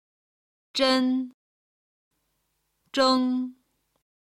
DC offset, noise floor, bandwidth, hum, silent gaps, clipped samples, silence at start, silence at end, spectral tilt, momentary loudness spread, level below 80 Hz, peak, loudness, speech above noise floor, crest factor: under 0.1%; -75 dBFS; 11.5 kHz; none; 1.34-2.11 s; under 0.1%; 0.75 s; 0.8 s; -2.5 dB/octave; 12 LU; -70 dBFS; -10 dBFS; -24 LUFS; 52 dB; 18 dB